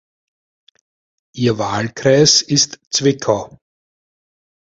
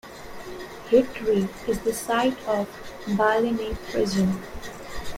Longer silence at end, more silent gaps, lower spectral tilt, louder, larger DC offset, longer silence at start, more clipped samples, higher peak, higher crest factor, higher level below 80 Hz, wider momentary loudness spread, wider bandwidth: first, 1.25 s vs 0 s; first, 2.87-2.91 s vs none; second, -3.5 dB/octave vs -5.5 dB/octave; first, -15 LUFS vs -24 LUFS; neither; first, 1.35 s vs 0.05 s; neither; first, 0 dBFS vs -6 dBFS; about the same, 18 dB vs 18 dB; second, -52 dBFS vs -46 dBFS; second, 10 LU vs 16 LU; second, 7.8 kHz vs 16.5 kHz